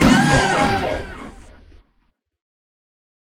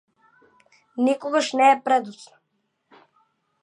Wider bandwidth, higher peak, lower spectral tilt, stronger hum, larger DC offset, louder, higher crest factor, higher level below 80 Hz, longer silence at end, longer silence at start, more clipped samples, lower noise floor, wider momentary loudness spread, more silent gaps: first, 16.5 kHz vs 11 kHz; first, 0 dBFS vs -6 dBFS; first, -5 dB/octave vs -3 dB/octave; neither; neither; first, -17 LUFS vs -21 LUFS; about the same, 20 dB vs 18 dB; first, -36 dBFS vs -82 dBFS; first, 2.05 s vs 1.5 s; second, 0 s vs 0.95 s; neither; second, -65 dBFS vs -74 dBFS; first, 23 LU vs 15 LU; neither